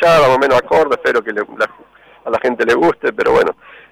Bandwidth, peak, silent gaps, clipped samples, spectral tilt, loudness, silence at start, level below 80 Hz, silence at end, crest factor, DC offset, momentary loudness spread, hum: 15.5 kHz; -6 dBFS; none; under 0.1%; -5 dB/octave; -14 LUFS; 0 s; -46 dBFS; 0.4 s; 8 dB; under 0.1%; 10 LU; none